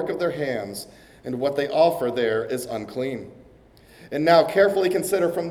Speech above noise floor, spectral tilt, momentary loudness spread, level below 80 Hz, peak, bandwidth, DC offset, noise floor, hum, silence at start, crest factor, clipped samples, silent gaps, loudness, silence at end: 29 dB; -5 dB/octave; 16 LU; -60 dBFS; -4 dBFS; 17 kHz; under 0.1%; -51 dBFS; none; 0 s; 18 dB; under 0.1%; none; -22 LUFS; 0 s